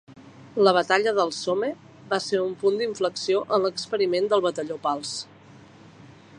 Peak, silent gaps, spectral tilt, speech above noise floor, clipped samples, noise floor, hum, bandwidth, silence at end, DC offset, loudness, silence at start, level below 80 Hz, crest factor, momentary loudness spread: -4 dBFS; none; -4 dB/octave; 25 dB; under 0.1%; -49 dBFS; none; 11 kHz; 0.3 s; under 0.1%; -24 LUFS; 0.1 s; -70 dBFS; 20 dB; 11 LU